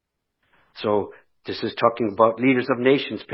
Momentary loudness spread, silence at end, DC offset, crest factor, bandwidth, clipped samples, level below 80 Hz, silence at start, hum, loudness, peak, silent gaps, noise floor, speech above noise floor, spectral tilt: 13 LU; 0 s; under 0.1%; 20 dB; 5.8 kHz; under 0.1%; -66 dBFS; 0.75 s; none; -21 LUFS; -2 dBFS; none; -73 dBFS; 52 dB; -10 dB/octave